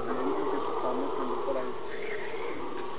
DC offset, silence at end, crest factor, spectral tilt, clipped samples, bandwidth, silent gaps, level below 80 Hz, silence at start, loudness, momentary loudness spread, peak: 2%; 0 s; 14 dB; -3.5 dB/octave; under 0.1%; 4 kHz; none; -64 dBFS; 0 s; -33 LUFS; 6 LU; -18 dBFS